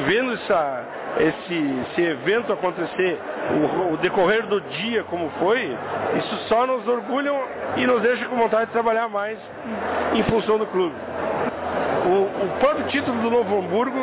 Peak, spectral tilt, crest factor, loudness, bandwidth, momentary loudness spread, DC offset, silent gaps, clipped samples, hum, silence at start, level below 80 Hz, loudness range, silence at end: -10 dBFS; -9.5 dB/octave; 12 dB; -22 LUFS; 4 kHz; 6 LU; under 0.1%; none; under 0.1%; none; 0 s; -54 dBFS; 1 LU; 0 s